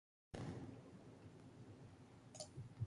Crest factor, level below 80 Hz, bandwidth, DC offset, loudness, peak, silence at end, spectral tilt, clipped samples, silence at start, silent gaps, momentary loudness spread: 20 dB; -70 dBFS; 11.5 kHz; under 0.1%; -57 LUFS; -36 dBFS; 0 s; -5.5 dB/octave; under 0.1%; 0.35 s; none; 10 LU